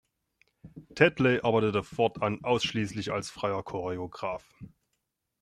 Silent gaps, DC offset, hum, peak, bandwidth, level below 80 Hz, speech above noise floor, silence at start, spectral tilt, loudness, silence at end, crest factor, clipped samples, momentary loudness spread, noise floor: none; under 0.1%; none; -6 dBFS; 12.5 kHz; -62 dBFS; 52 dB; 0.65 s; -5.5 dB/octave; -29 LUFS; 0.75 s; 24 dB; under 0.1%; 12 LU; -81 dBFS